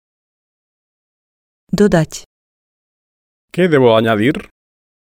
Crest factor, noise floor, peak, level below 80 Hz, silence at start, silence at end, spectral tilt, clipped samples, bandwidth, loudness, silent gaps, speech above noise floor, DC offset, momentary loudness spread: 18 dB; under -90 dBFS; 0 dBFS; -46 dBFS; 1.75 s; 0.65 s; -6 dB/octave; under 0.1%; 16 kHz; -14 LUFS; 2.26-3.48 s; over 77 dB; under 0.1%; 15 LU